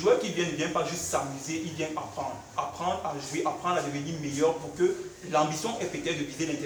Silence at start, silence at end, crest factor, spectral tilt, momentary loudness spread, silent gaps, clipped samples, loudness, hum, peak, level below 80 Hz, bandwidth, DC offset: 0 s; 0 s; 18 dB; -4 dB/octave; 7 LU; none; under 0.1%; -30 LUFS; none; -10 dBFS; -60 dBFS; over 20 kHz; under 0.1%